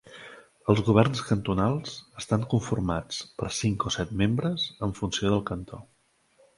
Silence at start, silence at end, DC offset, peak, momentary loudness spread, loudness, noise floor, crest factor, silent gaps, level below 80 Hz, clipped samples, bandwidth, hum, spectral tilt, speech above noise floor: 0.05 s; 0.75 s; under 0.1%; -4 dBFS; 16 LU; -27 LUFS; -65 dBFS; 24 dB; none; -48 dBFS; under 0.1%; 11.5 kHz; none; -5.5 dB/octave; 38 dB